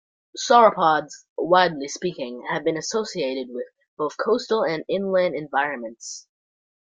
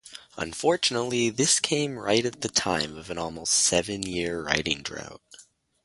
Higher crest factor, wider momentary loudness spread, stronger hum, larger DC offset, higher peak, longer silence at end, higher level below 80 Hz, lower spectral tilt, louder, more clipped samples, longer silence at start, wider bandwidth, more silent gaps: about the same, 22 dB vs 24 dB; first, 18 LU vs 13 LU; neither; neither; about the same, -2 dBFS vs -4 dBFS; first, 0.6 s vs 0.45 s; second, -68 dBFS vs -54 dBFS; about the same, -3.5 dB/octave vs -2.5 dB/octave; first, -22 LUFS vs -25 LUFS; neither; first, 0.35 s vs 0.05 s; second, 9.4 kHz vs 11.5 kHz; first, 1.29-1.36 s, 3.88-3.97 s vs none